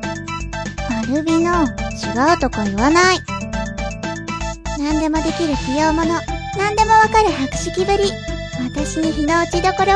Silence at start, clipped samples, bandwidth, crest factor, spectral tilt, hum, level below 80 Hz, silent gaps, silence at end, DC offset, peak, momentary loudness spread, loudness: 0 s; under 0.1%; 10.5 kHz; 18 dB; -4.5 dB/octave; none; -32 dBFS; none; 0 s; under 0.1%; 0 dBFS; 12 LU; -18 LUFS